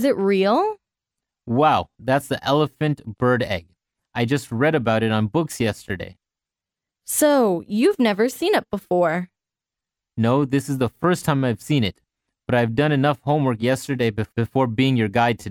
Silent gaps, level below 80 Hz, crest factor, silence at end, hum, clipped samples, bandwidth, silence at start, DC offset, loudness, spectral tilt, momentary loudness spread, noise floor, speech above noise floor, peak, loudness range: none; -54 dBFS; 16 dB; 0 s; none; under 0.1%; over 20 kHz; 0 s; under 0.1%; -21 LUFS; -6 dB/octave; 8 LU; -88 dBFS; 68 dB; -4 dBFS; 2 LU